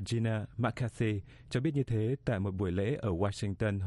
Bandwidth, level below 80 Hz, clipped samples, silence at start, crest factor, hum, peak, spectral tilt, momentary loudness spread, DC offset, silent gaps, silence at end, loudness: 11.5 kHz; -56 dBFS; under 0.1%; 0 s; 14 dB; none; -18 dBFS; -7.5 dB/octave; 2 LU; under 0.1%; none; 0 s; -33 LUFS